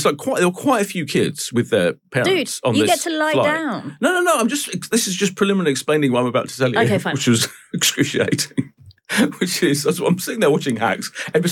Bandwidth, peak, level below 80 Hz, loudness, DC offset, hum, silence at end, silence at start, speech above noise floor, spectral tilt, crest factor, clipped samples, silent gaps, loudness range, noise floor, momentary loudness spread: 18 kHz; -4 dBFS; -66 dBFS; -19 LUFS; under 0.1%; none; 0 s; 0 s; 20 dB; -4 dB/octave; 14 dB; under 0.1%; none; 1 LU; -38 dBFS; 5 LU